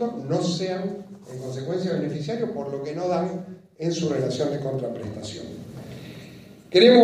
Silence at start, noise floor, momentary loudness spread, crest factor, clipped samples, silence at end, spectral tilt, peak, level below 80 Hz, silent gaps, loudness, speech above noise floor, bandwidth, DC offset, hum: 0 s; -45 dBFS; 15 LU; 22 dB; under 0.1%; 0 s; -6 dB/octave; -2 dBFS; -62 dBFS; none; -26 LUFS; 21 dB; 12 kHz; under 0.1%; none